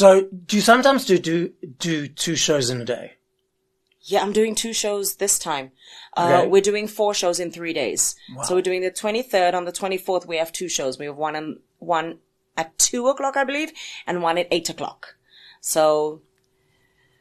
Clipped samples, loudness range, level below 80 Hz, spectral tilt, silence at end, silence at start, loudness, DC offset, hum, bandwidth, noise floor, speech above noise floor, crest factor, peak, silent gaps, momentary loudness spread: under 0.1%; 4 LU; -62 dBFS; -3 dB/octave; 1.05 s; 0 s; -21 LUFS; under 0.1%; none; 13 kHz; -72 dBFS; 51 dB; 20 dB; -2 dBFS; none; 12 LU